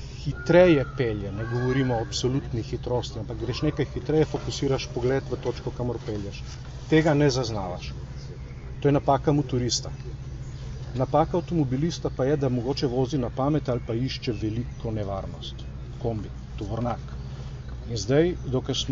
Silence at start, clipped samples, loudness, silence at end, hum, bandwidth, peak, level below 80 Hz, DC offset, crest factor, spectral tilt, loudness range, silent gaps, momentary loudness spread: 0 s; under 0.1%; -26 LUFS; 0 s; none; 7.6 kHz; -6 dBFS; -40 dBFS; under 0.1%; 20 dB; -6 dB/octave; 6 LU; none; 15 LU